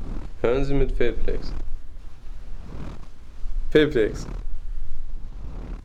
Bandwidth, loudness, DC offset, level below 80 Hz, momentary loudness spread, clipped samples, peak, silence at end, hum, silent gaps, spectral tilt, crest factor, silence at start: 7.2 kHz; -25 LUFS; under 0.1%; -28 dBFS; 22 LU; under 0.1%; -4 dBFS; 0 s; none; none; -7 dB/octave; 16 dB; 0 s